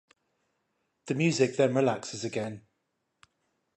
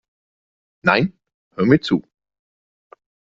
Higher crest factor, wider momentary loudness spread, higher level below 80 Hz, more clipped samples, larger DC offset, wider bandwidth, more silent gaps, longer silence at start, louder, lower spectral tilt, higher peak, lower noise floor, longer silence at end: about the same, 20 dB vs 22 dB; about the same, 11 LU vs 9 LU; second, -74 dBFS vs -56 dBFS; neither; neither; first, 11 kHz vs 7.6 kHz; second, none vs 1.34-1.51 s; first, 1.05 s vs 0.85 s; second, -28 LUFS vs -19 LUFS; second, -5.5 dB/octave vs -7.5 dB/octave; second, -12 dBFS vs 0 dBFS; second, -80 dBFS vs under -90 dBFS; second, 1.2 s vs 1.35 s